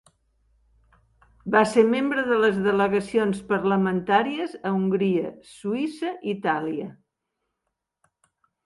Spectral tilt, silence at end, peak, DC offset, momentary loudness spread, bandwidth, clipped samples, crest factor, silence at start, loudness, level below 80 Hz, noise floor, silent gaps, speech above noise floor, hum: -6.5 dB/octave; 1.75 s; -6 dBFS; under 0.1%; 11 LU; 11.5 kHz; under 0.1%; 20 dB; 1.45 s; -23 LUFS; -62 dBFS; -81 dBFS; none; 58 dB; none